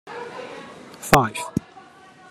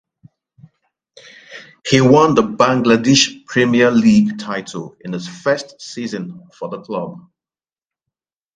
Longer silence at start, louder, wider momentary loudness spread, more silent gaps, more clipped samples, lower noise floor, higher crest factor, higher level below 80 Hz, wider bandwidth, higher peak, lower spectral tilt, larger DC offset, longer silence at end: second, 0.05 s vs 1.5 s; second, -21 LUFS vs -15 LUFS; about the same, 20 LU vs 19 LU; neither; neither; second, -47 dBFS vs under -90 dBFS; first, 26 dB vs 18 dB; first, -46 dBFS vs -54 dBFS; first, 14 kHz vs 9.4 kHz; about the same, 0 dBFS vs 0 dBFS; about the same, -4.5 dB/octave vs -5 dB/octave; neither; second, 0.5 s vs 1.35 s